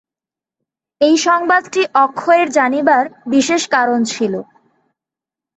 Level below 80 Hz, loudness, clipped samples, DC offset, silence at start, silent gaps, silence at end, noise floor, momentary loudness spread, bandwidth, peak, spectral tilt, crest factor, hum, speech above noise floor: -64 dBFS; -14 LUFS; under 0.1%; under 0.1%; 1 s; none; 1.15 s; -88 dBFS; 5 LU; 8.4 kHz; -2 dBFS; -3 dB/octave; 14 dB; none; 74 dB